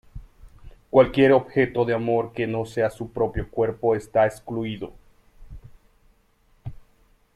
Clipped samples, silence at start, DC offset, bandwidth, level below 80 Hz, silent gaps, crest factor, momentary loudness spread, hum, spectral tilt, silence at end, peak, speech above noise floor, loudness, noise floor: under 0.1%; 0.15 s; under 0.1%; 12.5 kHz; -46 dBFS; none; 22 dB; 19 LU; none; -7.5 dB/octave; 0.6 s; -2 dBFS; 39 dB; -22 LUFS; -61 dBFS